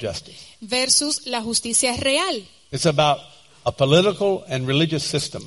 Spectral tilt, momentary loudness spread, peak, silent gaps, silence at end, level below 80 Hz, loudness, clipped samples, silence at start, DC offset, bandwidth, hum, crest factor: -3.5 dB/octave; 12 LU; -2 dBFS; none; 0 s; -52 dBFS; -20 LUFS; under 0.1%; 0 s; 0.1%; 11.5 kHz; none; 20 dB